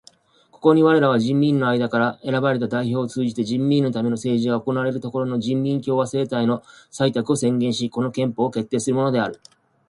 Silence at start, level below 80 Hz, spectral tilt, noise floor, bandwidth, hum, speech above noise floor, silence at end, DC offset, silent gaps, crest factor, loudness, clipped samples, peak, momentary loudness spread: 0.65 s; -62 dBFS; -6.5 dB/octave; -56 dBFS; 11.5 kHz; none; 35 dB; 0.55 s; under 0.1%; none; 18 dB; -21 LUFS; under 0.1%; -2 dBFS; 6 LU